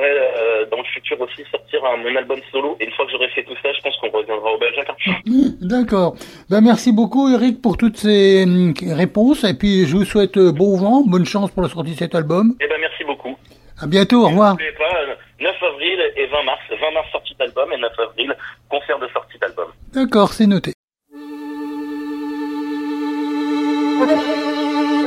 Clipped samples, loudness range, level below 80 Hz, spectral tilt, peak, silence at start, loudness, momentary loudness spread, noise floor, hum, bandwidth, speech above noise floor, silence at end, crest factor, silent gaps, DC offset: under 0.1%; 7 LU; -46 dBFS; -6 dB/octave; 0 dBFS; 0 s; -17 LUFS; 12 LU; -37 dBFS; none; 13.5 kHz; 21 dB; 0 s; 16 dB; 20.74-20.88 s; under 0.1%